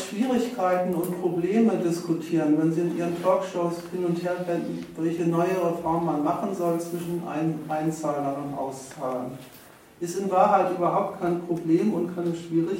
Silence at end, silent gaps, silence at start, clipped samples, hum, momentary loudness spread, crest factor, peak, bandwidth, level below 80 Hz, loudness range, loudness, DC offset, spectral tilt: 0 s; none; 0 s; under 0.1%; none; 9 LU; 18 dB; -6 dBFS; 16.5 kHz; -66 dBFS; 5 LU; -26 LUFS; under 0.1%; -7 dB/octave